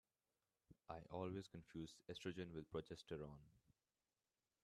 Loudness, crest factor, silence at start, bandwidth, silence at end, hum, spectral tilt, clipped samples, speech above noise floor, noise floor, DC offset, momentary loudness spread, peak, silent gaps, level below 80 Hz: -54 LUFS; 22 dB; 0.7 s; 13 kHz; 1.05 s; none; -6 dB/octave; under 0.1%; over 37 dB; under -90 dBFS; under 0.1%; 8 LU; -34 dBFS; none; -76 dBFS